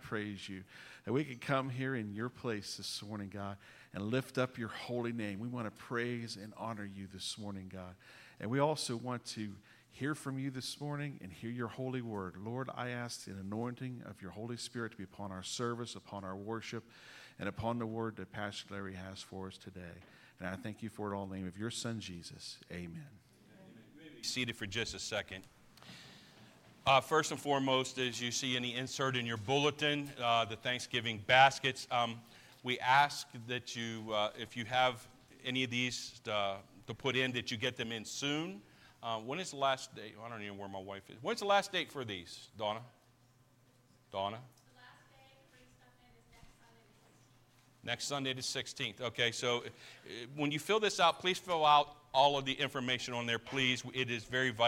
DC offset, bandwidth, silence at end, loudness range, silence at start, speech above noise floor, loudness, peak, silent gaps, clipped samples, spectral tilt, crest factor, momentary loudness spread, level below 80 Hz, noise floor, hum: under 0.1%; 16.5 kHz; 0 s; 12 LU; 0 s; 31 dB; -36 LUFS; -12 dBFS; none; under 0.1%; -4 dB/octave; 26 dB; 17 LU; -72 dBFS; -68 dBFS; none